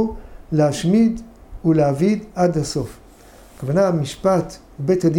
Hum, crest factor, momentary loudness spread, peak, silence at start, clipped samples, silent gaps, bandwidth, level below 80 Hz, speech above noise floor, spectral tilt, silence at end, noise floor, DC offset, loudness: none; 14 dB; 14 LU; -4 dBFS; 0 s; under 0.1%; none; 16.5 kHz; -42 dBFS; 27 dB; -7 dB/octave; 0 s; -45 dBFS; under 0.1%; -19 LUFS